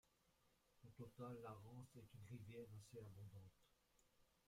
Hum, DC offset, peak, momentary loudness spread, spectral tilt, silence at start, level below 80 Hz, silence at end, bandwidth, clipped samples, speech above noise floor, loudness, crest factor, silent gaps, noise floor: none; under 0.1%; -44 dBFS; 8 LU; -7 dB/octave; 0.05 s; -82 dBFS; 0 s; 16 kHz; under 0.1%; 23 dB; -60 LUFS; 18 dB; none; -82 dBFS